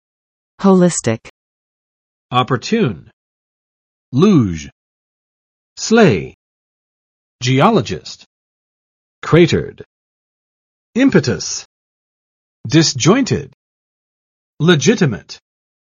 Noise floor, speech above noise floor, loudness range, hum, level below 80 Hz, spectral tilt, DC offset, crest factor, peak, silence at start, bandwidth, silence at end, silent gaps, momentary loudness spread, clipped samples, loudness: under -90 dBFS; over 77 dB; 4 LU; none; -50 dBFS; -5.5 dB/octave; under 0.1%; 18 dB; 0 dBFS; 0.6 s; 8.8 kHz; 0.55 s; 1.30-2.29 s, 3.13-4.12 s, 4.72-5.76 s, 6.34-7.39 s, 8.26-9.22 s, 9.86-10.93 s, 11.65-12.64 s, 13.54-14.57 s; 17 LU; under 0.1%; -14 LUFS